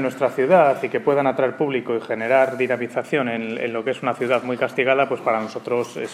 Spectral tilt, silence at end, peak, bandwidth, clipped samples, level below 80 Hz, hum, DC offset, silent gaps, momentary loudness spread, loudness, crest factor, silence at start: -6 dB/octave; 0 s; -4 dBFS; 13.5 kHz; under 0.1%; -76 dBFS; none; under 0.1%; none; 8 LU; -21 LUFS; 18 dB; 0 s